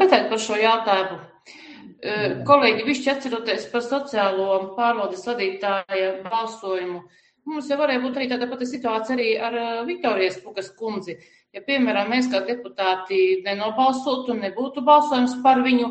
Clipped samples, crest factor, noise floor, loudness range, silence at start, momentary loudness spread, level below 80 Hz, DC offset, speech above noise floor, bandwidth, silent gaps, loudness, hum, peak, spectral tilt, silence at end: under 0.1%; 20 dB; -45 dBFS; 5 LU; 0 s; 15 LU; -68 dBFS; under 0.1%; 23 dB; 8.8 kHz; none; -22 LUFS; none; -2 dBFS; -4 dB/octave; 0 s